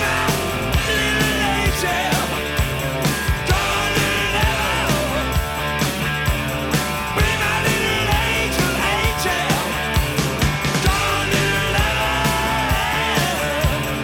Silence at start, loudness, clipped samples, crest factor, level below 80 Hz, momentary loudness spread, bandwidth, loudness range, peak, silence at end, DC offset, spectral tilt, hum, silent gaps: 0 s; -19 LUFS; under 0.1%; 16 dB; -28 dBFS; 3 LU; 18 kHz; 1 LU; -4 dBFS; 0 s; under 0.1%; -4 dB/octave; none; none